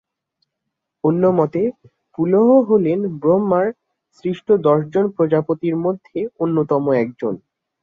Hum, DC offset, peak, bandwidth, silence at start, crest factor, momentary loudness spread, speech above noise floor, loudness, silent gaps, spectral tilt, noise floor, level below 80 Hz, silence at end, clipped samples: none; under 0.1%; -2 dBFS; 6.6 kHz; 1.05 s; 16 dB; 12 LU; 62 dB; -18 LUFS; none; -10.5 dB/octave; -79 dBFS; -62 dBFS; 0.45 s; under 0.1%